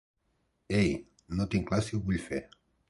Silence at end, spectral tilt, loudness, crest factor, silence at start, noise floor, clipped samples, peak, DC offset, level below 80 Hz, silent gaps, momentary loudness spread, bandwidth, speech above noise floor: 0.45 s; -6.5 dB/octave; -32 LUFS; 18 dB; 0.7 s; -76 dBFS; under 0.1%; -14 dBFS; under 0.1%; -48 dBFS; none; 10 LU; 11.5 kHz; 46 dB